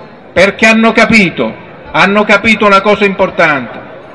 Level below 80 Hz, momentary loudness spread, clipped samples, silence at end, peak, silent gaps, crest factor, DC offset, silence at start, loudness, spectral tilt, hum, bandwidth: -40 dBFS; 11 LU; 1%; 0 s; 0 dBFS; none; 10 dB; 0.6%; 0 s; -8 LUFS; -5 dB/octave; none; 12 kHz